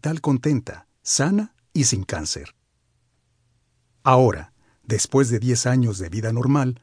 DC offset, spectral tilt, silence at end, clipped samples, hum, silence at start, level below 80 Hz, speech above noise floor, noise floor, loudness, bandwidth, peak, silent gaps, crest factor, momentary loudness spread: under 0.1%; -5 dB/octave; 0.05 s; under 0.1%; none; 0 s; -50 dBFS; 47 dB; -68 dBFS; -21 LUFS; 10.5 kHz; -2 dBFS; none; 20 dB; 10 LU